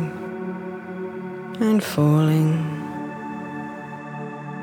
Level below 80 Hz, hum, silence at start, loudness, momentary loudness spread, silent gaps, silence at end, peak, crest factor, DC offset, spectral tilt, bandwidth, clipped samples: -64 dBFS; none; 0 s; -24 LUFS; 15 LU; none; 0 s; -8 dBFS; 16 dB; under 0.1%; -7.5 dB/octave; 17.5 kHz; under 0.1%